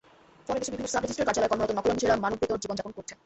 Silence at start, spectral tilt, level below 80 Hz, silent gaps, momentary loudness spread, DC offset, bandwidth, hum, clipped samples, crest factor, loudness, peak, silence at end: 0.5 s; -4 dB/octave; -54 dBFS; none; 9 LU; under 0.1%; 8.4 kHz; none; under 0.1%; 18 dB; -28 LUFS; -12 dBFS; 0.1 s